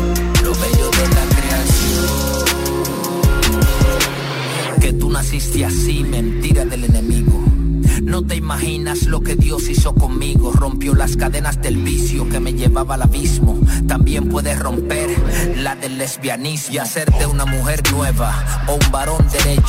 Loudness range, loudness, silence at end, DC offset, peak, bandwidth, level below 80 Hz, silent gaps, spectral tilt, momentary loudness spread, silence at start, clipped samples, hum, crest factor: 2 LU; -17 LUFS; 0 s; under 0.1%; -2 dBFS; 16.5 kHz; -18 dBFS; none; -5 dB/octave; 5 LU; 0 s; under 0.1%; none; 12 dB